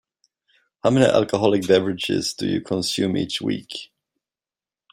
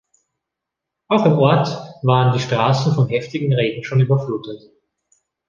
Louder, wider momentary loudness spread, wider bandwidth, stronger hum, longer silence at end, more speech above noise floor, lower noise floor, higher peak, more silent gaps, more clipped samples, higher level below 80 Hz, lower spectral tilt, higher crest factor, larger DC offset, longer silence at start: second, -21 LUFS vs -18 LUFS; about the same, 9 LU vs 10 LU; first, 16 kHz vs 7.2 kHz; neither; first, 1.05 s vs 0.9 s; first, over 70 dB vs 66 dB; first, under -90 dBFS vs -82 dBFS; about the same, -2 dBFS vs -2 dBFS; neither; neither; about the same, -60 dBFS vs -56 dBFS; second, -5 dB/octave vs -7.5 dB/octave; about the same, 20 dB vs 16 dB; neither; second, 0.85 s vs 1.1 s